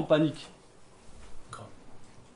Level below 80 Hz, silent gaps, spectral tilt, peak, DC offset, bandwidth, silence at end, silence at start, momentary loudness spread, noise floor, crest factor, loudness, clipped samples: -56 dBFS; none; -6.5 dB/octave; -10 dBFS; under 0.1%; 10.5 kHz; 0.15 s; 0 s; 28 LU; -53 dBFS; 22 dB; -29 LUFS; under 0.1%